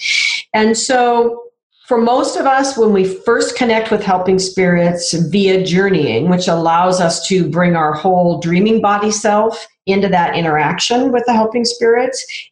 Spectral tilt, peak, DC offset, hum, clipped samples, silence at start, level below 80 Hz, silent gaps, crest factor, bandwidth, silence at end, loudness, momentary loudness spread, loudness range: -4.5 dB/octave; -4 dBFS; under 0.1%; none; under 0.1%; 0 s; -50 dBFS; 1.63-1.70 s; 10 dB; 11 kHz; 0.05 s; -14 LUFS; 3 LU; 1 LU